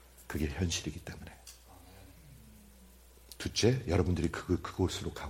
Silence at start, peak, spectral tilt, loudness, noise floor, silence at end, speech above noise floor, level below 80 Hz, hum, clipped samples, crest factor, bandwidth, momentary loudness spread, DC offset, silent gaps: 0.2 s; -14 dBFS; -5 dB/octave; -33 LUFS; -57 dBFS; 0 s; 24 dB; -48 dBFS; none; under 0.1%; 22 dB; 16.5 kHz; 25 LU; under 0.1%; none